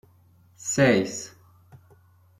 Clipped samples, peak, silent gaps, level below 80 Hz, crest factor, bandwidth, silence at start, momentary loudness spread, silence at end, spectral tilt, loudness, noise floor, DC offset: under 0.1%; -6 dBFS; none; -64 dBFS; 22 dB; 15 kHz; 0.6 s; 17 LU; 0.65 s; -4.5 dB/octave; -24 LUFS; -58 dBFS; under 0.1%